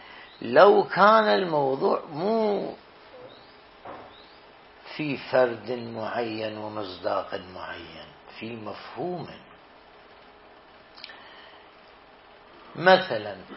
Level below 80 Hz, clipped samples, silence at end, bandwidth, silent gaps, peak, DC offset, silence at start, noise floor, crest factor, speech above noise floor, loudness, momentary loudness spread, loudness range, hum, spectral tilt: -68 dBFS; under 0.1%; 0 s; 5.8 kHz; none; -2 dBFS; under 0.1%; 0 s; -52 dBFS; 24 dB; 28 dB; -24 LUFS; 26 LU; 19 LU; none; -9 dB/octave